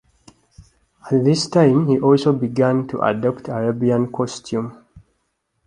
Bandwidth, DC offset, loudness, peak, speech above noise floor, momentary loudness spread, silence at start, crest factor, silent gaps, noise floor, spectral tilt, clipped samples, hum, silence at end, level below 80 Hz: 11 kHz; under 0.1%; -18 LUFS; -2 dBFS; 53 dB; 10 LU; 0.6 s; 18 dB; none; -71 dBFS; -7 dB/octave; under 0.1%; none; 0.7 s; -56 dBFS